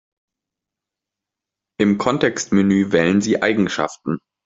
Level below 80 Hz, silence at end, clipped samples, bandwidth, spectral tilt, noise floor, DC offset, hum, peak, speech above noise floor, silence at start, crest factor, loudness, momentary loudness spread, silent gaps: -56 dBFS; 0.3 s; under 0.1%; 7.8 kHz; -5.5 dB/octave; -85 dBFS; under 0.1%; none; -2 dBFS; 68 dB; 1.8 s; 18 dB; -18 LUFS; 7 LU; none